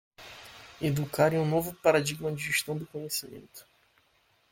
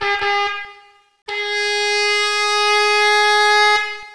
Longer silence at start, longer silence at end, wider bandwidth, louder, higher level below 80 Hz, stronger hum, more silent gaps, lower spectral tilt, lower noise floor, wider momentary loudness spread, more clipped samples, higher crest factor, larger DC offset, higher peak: first, 0.2 s vs 0 s; first, 0.9 s vs 0 s; first, 17 kHz vs 11 kHz; second, -29 LUFS vs -15 LUFS; about the same, -62 dBFS vs -60 dBFS; neither; second, none vs 1.22-1.26 s; first, -4.5 dB/octave vs 1 dB/octave; first, -68 dBFS vs -48 dBFS; first, 22 LU vs 11 LU; neither; first, 22 dB vs 14 dB; second, under 0.1% vs 0.8%; second, -10 dBFS vs -2 dBFS